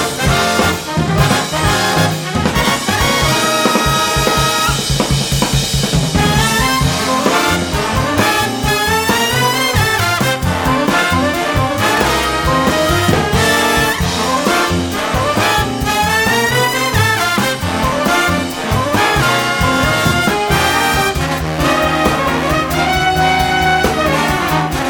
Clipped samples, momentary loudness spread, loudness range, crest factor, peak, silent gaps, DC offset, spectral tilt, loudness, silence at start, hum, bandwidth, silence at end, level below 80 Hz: under 0.1%; 3 LU; 1 LU; 14 dB; 0 dBFS; none; under 0.1%; -4 dB/octave; -13 LUFS; 0 s; none; over 20 kHz; 0 s; -28 dBFS